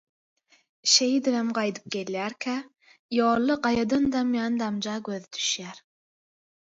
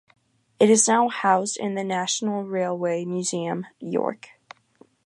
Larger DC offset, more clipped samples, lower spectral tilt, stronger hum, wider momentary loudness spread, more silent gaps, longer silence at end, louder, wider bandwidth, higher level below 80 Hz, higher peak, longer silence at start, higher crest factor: neither; neither; about the same, -2.5 dB/octave vs -3.5 dB/octave; neither; about the same, 12 LU vs 12 LU; first, 2.99-3.09 s vs none; about the same, 0.9 s vs 0.9 s; second, -26 LUFS vs -23 LUFS; second, 8 kHz vs 11.5 kHz; first, -62 dBFS vs -78 dBFS; about the same, -6 dBFS vs -4 dBFS; first, 0.85 s vs 0.6 s; about the same, 22 dB vs 20 dB